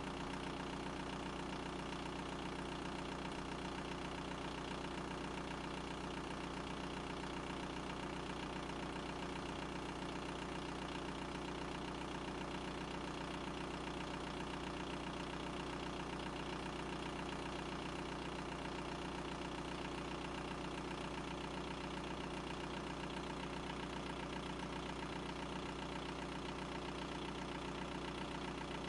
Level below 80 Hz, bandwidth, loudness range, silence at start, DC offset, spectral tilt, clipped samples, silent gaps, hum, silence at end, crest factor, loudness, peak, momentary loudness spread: -56 dBFS; 11.5 kHz; 0 LU; 0 s; under 0.1%; -5 dB/octave; under 0.1%; none; 60 Hz at -55 dBFS; 0 s; 14 dB; -45 LUFS; -32 dBFS; 0 LU